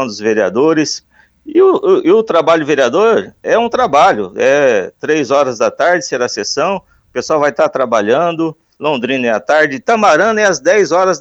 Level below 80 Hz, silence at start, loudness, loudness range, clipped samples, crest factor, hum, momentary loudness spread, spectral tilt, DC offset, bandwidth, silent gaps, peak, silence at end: -56 dBFS; 0 s; -12 LUFS; 3 LU; under 0.1%; 12 dB; none; 7 LU; -4 dB/octave; under 0.1%; 8.2 kHz; none; 0 dBFS; 0 s